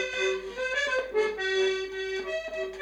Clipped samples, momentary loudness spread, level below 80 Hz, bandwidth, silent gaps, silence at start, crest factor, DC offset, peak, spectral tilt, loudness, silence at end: under 0.1%; 6 LU; -58 dBFS; 10.5 kHz; none; 0 s; 14 dB; under 0.1%; -16 dBFS; -2 dB/octave; -29 LUFS; 0 s